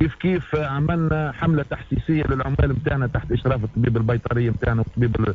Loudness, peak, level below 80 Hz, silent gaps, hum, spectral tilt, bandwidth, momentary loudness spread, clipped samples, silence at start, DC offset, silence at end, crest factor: -22 LUFS; -6 dBFS; -32 dBFS; none; none; -9.5 dB/octave; 4.6 kHz; 3 LU; under 0.1%; 0 s; under 0.1%; 0 s; 14 dB